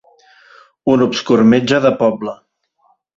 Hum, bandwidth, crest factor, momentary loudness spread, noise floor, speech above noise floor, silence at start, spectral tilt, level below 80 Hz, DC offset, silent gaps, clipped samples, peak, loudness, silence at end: none; 7.8 kHz; 14 dB; 12 LU; -59 dBFS; 46 dB; 0.85 s; -6 dB/octave; -54 dBFS; under 0.1%; none; under 0.1%; -2 dBFS; -14 LUFS; 0.8 s